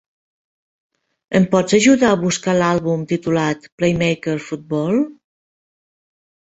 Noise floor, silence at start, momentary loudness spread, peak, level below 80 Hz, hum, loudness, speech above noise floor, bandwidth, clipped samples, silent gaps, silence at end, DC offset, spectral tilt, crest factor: under -90 dBFS; 1.3 s; 10 LU; -2 dBFS; -52 dBFS; none; -17 LUFS; over 73 dB; 8.2 kHz; under 0.1%; 3.72-3.78 s; 1.35 s; under 0.1%; -5.5 dB/octave; 18 dB